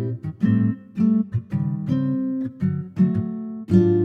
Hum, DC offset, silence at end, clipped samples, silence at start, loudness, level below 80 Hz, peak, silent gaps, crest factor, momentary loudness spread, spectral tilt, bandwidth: none; under 0.1%; 0 s; under 0.1%; 0 s; -23 LUFS; -54 dBFS; -4 dBFS; none; 16 dB; 7 LU; -11 dB/octave; 4.8 kHz